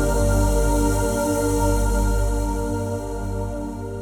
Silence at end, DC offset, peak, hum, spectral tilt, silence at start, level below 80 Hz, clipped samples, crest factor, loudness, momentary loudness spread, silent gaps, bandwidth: 0 s; under 0.1%; -8 dBFS; 50 Hz at -30 dBFS; -6 dB/octave; 0 s; -24 dBFS; under 0.1%; 14 dB; -23 LUFS; 8 LU; none; 18.5 kHz